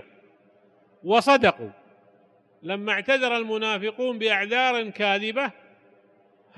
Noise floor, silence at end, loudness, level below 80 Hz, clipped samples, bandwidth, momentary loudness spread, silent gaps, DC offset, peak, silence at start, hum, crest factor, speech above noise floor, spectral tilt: -60 dBFS; 1.05 s; -23 LUFS; -66 dBFS; under 0.1%; 12 kHz; 14 LU; none; under 0.1%; -6 dBFS; 1.05 s; none; 20 dB; 36 dB; -4 dB/octave